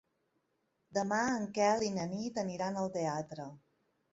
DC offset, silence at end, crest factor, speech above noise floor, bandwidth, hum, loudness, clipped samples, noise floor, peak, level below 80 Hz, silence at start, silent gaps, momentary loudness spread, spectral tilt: under 0.1%; 0.55 s; 18 dB; 46 dB; 8 kHz; none; -35 LUFS; under 0.1%; -80 dBFS; -18 dBFS; -72 dBFS; 0.9 s; none; 11 LU; -4.5 dB/octave